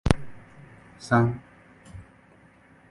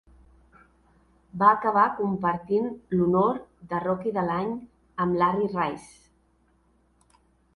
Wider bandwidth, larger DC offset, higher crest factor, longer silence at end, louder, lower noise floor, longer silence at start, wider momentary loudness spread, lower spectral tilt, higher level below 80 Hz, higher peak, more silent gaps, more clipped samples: about the same, 11.5 kHz vs 11.5 kHz; neither; first, 28 dB vs 22 dB; second, 0.9 s vs 1.7 s; about the same, -25 LUFS vs -25 LUFS; second, -56 dBFS vs -65 dBFS; second, 0.05 s vs 1.35 s; first, 27 LU vs 13 LU; about the same, -7 dB/octave vs -8 dB/octave; first, -40 dBFS vs -60 dBFS; first, 0 dBFS vs -4 dBFS; neither; neither